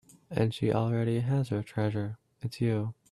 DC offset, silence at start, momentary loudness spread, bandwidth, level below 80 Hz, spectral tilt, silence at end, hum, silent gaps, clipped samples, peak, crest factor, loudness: under 0.1%; 0.3 s; 9 LU; 12 kHz; -60 dBFS; -8 dB/octave; 0.2 s; none; none; under 0.1%; -12 dBFS; 18 dB; -31 LUFS